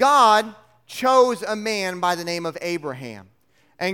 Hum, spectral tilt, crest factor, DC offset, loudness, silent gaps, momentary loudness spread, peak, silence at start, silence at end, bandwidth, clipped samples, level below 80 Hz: none; -3.5 dB/octave; 20 dB; under 0.1%; -20 LUFS; none; 19 LU; -2 dBFS; 0 s; 0 s; 17.5 kHz; under 0.1%; -68 dBFS